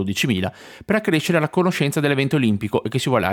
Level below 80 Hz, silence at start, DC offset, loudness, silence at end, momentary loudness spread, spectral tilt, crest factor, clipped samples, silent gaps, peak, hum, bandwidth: -56 dBFS; 0 s; under 0.1%; -20 LUFS; 0 s; 4 LU; -5.5 dB/octave; 16 dB; under 0.1%; none; -4 dBFS; none; 19 kHz